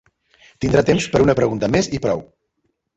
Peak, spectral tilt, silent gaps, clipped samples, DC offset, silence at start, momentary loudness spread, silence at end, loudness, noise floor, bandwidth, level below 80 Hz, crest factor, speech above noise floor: -2 dBFS; -6 dB/octave; none; under 0.1%; under 0.1%; 0.6 s; 8 LU; 0.75 s; -18 LUFS; -71 dBFS; 8.4 kHz; -42 dBFS; 18 dB; 54 dB